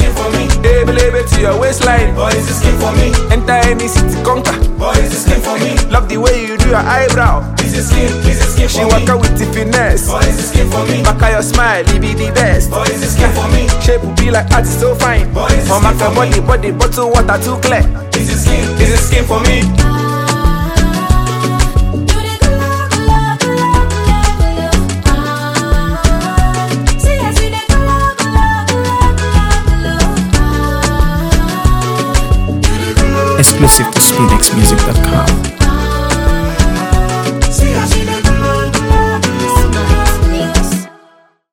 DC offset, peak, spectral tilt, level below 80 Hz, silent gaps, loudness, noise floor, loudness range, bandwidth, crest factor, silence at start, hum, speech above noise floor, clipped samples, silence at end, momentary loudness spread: under 0.1%; 0 dBFS; -4.5 dB/octave; -14 dBFS; none; -11 LUFS; -47 dBFS; 4 LU; over 20 kHz; 10 dB; 0 s; none; 37 dB; 0.3%; 0.65 s; 4 LU